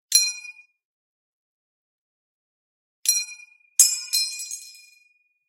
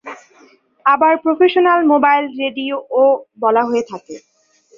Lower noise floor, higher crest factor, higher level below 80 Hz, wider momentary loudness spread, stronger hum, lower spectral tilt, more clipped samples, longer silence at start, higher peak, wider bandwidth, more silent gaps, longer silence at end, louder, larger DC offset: first, -64 dBFS vs -50 dBFS; first, 28 dB vs 14 dB; second, under -90 dBFS vs -66 dBFS; first, 19 LU vs 10 LU; neither; second, 9 dB/octave vs -4.5 dB/octave; neither; about the same, 0.1 s vs 0.05 s; about the same, 0 dBFS vs -2 dBFS; first, 16 kHz vs 7.4 kHz; first, 0.85-3.03 s vs none; first, 0.75 s vs 0.6 s; second, -20 LUFS vs -15 LUFS; neither